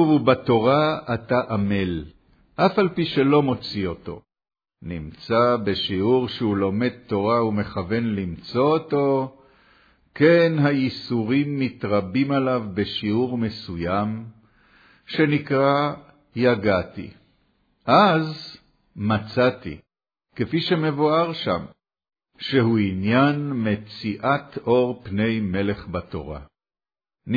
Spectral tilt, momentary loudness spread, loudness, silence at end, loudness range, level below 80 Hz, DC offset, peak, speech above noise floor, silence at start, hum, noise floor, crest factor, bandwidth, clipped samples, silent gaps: -8.5 dB/octave; 15 LU; -22 LUFS; 0 s; 3 LU; -52 dBFS; under 0.1%; -4 dBFS; over 69 dB; 0 s; none; under -90 dBFS; 18 dB; 5 kHz; under 0.1%; none